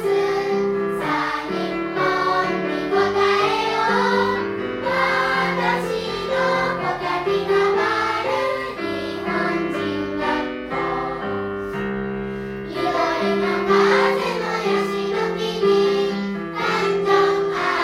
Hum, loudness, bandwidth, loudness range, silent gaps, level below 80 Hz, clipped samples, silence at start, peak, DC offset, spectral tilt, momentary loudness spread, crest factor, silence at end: none; -21 LUFS; 14 kHz; 5 LU; none; -50 dBFS; under 0.1%; 0 s; -4 dBFS; under 0.1%; -5 dB/octave; 8 LU; 16 dB; 0 s